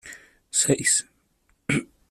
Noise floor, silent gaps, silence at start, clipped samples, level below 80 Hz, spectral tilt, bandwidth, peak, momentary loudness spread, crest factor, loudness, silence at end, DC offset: -67 dBFS; none; 0.05 s; under 0.1%; -58 dBFS; -2.5 dB/octave; 15 kHz; -8 dBFS; 14 LU; 20 dB; -23 LUFS; 0.25 s; under 0.1%